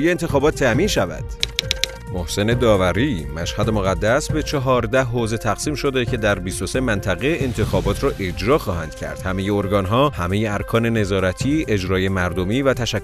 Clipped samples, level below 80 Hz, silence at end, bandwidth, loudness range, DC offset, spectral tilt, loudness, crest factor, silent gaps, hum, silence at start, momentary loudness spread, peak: under 0.1%; -34 dBFS; 0 s; 14 kHz; 2 LU; under 0.1%; -5.5 dB/octave; -20 LUFS; 20 dB; none; none; 0 s; 6 LU; 0 dBFS